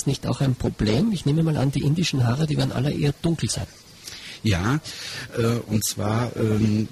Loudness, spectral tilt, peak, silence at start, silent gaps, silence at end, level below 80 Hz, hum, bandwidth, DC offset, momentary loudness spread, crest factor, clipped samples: -23 LUFS; -5.5 dB/octave; -10 dBFS; 0 s; none; 0 s; -44 dBFS; none; 14 kHz; under 0.1%; 9 LU; 14 dB; under 0.1%